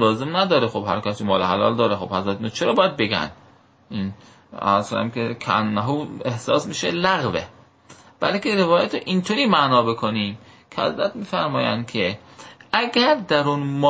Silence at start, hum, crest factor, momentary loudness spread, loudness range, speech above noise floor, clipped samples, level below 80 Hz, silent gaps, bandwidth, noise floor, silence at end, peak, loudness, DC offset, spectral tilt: 0 s; none; 20 dB; 10 LU; 3 LU; 28 dB; under 0.1%; -54 dBFS; none; 8 kHz; -49 dBFS; 0 s; -2 dBFS; -21 LUFS; under 0.1%; -5.5 dB/octave